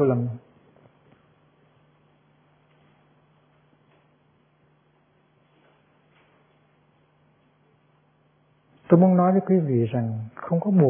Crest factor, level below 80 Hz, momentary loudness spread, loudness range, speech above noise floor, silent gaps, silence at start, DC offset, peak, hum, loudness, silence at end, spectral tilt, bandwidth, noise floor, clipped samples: 24 dB; -72 dBFS; 15 LU; 12 LU; 43 dB; none; 0 s; under 0.1%; -4 dBFS; none; -22 LUFS; 0 s; -13.5 dB/octave; 3.4 kHz; -63 dBFS; under 0.1%